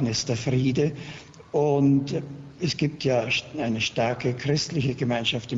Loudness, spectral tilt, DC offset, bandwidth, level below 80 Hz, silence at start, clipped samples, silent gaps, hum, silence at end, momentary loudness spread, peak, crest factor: -25 LUFS; -5.5 dB/octave; under 0.1%; 8 kHz; -54 dBFS; 0 s; under 0.1%; none; none; 0 s; 9 LU; -10 dBFS; 14 dB